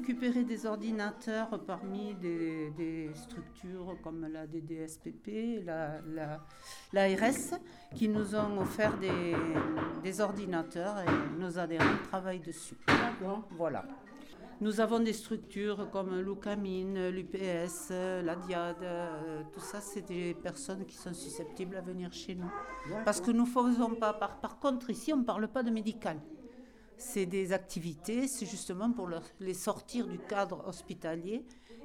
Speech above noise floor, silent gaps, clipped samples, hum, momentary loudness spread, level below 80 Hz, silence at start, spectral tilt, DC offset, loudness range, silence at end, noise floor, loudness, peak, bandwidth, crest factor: 20 dB; none; under 0.1%; none; 13 LU; -64 dBFS; 0 s; -5 dB/octave; under 0.1%; 8 LU; 0 s; -55 dBFS; -35 LUFS; -14 dBFS; 16.5 kHz; 22 dB